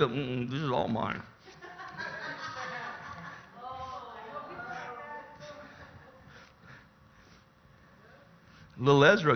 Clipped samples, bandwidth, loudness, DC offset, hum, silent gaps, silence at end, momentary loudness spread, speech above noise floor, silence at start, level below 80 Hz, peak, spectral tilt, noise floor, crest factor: under 0.1%; 6.6 kHz; -32 LUFS; under 0.1%; none; none; 0 s; 25 LU; 33 dB; 0 s; -64 dBFS; -8 dBFS; -6 dB/octave; -59 dBFS; 26 dB